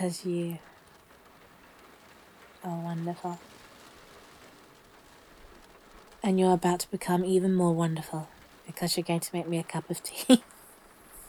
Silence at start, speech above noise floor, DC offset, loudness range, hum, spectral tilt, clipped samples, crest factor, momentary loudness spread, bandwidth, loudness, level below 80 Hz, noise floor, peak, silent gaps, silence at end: 0 s; 28 dB; under 0.1%; 13 LU; none; -5.5 dB/octave; under 0.1%; 24 dB; 27 LU; over 20 kHz; -29 LUFS; -64 dBFS; -56 dBFS; -6 dBFS; none; 0 s